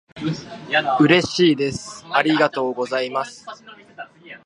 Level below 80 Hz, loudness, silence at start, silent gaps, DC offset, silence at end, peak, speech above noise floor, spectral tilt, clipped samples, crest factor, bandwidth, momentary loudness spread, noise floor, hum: -56 dBFS; -19 LUFS; 0.15 s; none; under 0.1%; 0.1 s; 0 dBFS; 19 dB; -5 dB/octave; under 0.1%; 20 dB; 11 kHz; 23 LU; -39 dBFS; none